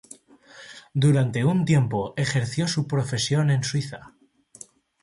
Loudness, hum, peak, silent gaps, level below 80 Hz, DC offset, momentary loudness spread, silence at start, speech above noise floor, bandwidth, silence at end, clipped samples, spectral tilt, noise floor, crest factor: -23 LUFS; none; -10 dBFS; none; -56 dBFS; under 0.1%; 22 LU; 0.55 s; 28 dB; 11.5 kHz; 1 s; under 0.1%; -5.5 dB/octave; -50 dBFS; 14 dB